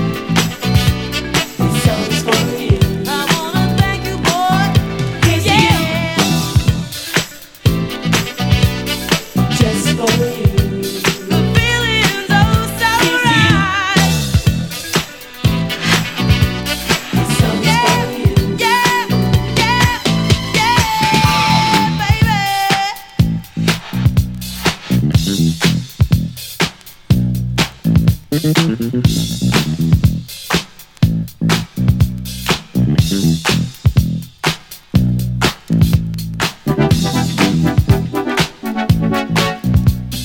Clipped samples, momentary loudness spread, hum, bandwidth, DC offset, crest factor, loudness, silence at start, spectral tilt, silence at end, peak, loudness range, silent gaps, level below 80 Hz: under 0.1%; 6 LU; none; 17.5 kHz; under 0.1%; 14 dB; -15 LUFS; 0 s; -5 dB/octave; 0 s; 0 dBFS; 3 LU; none; -28 dBFS